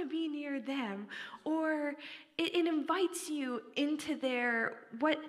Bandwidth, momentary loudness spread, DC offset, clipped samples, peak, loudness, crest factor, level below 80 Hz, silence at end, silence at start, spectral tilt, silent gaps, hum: 15 kHz; 9 LU; under 0.1%; under 0.1%; -18 dBFS; -35 LUFS; 18 dB; -86 dBFS; 0 s; 0 s; -3 dB/octave; none; none